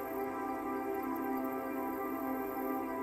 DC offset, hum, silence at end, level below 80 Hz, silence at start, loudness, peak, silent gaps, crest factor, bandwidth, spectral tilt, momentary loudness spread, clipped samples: under 0.1%; none; 0 s; -66 dBFS; 0 s; -38 LUFS; -24 dBFS; none; 12 dB; 16 kHz; -6 dB/octave; 1 LU; under 0.1%